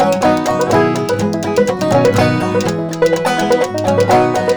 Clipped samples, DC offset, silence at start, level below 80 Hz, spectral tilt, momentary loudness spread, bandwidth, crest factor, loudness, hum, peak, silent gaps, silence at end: under 0.1%; 0.3%; 0 s; -44 dBFS; -5.5 dB/octave; 4 LU; over 20 kHz; 12 dB; -14 LUFS; none; -2 dBFS; none; 0 s